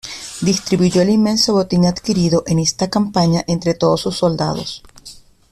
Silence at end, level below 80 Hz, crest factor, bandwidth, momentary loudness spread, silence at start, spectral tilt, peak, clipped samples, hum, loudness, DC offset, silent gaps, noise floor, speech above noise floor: 0.35 s; -44 dBFS; 14 dB; 13.5 kHz; 7 LU; 0.05 s; -5.5 dB/octave; -2 dBFS; under 0.1%; none; -16 LUFS; under 0.1%; none; -41 dBFS; 26 dB